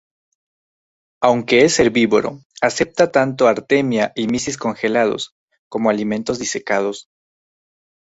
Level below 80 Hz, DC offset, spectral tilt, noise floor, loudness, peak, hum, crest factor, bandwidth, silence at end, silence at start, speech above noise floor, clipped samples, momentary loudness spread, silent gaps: -54 dBFS; under 0.1%; -4 dB/octave; under -90 dBFS; -17 LUFS; 0 dBFS; none; 18 dB; 8 kHz; 1.1 s; 1.2 s; over 73 dB; under 0.1%; 9 LU; 2.45-2.50 s, 5.32-5.48 s, 5.58-5.71 s